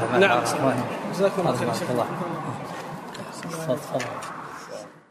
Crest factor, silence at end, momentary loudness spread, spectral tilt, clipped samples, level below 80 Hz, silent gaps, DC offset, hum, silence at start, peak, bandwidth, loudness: 22 dB; 0.1 s; 16 LU; -5 dB/octave; under 0.1%; -64 dBFS; none; under 0.1%; none; 0 s; -4 dBFS; 15.5 kHz; -26 LUFS